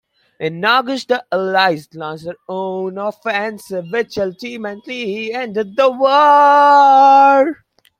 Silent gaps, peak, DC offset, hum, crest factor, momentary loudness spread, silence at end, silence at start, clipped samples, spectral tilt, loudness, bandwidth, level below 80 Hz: none; -2 dBFS; under 0.1%; none; 14 dB; 18 LU; 0.45 s; 0.4 s; under 0.1%; -5 dB/octave; -14 LUFS; 15 kHz; -64 dBFS